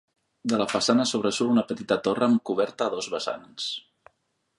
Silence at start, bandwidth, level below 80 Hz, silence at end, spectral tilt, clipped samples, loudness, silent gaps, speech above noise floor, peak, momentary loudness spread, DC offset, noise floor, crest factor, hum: 0.45 s; 11.5 kHz; -68 dBFS; 0.8 s; -4 dB/octave; under 0.1%; -25 LUFS; none; 49 dB; -8 dBFS; 10 LU; under 0.1%; -74 dBFS; 18 dB; none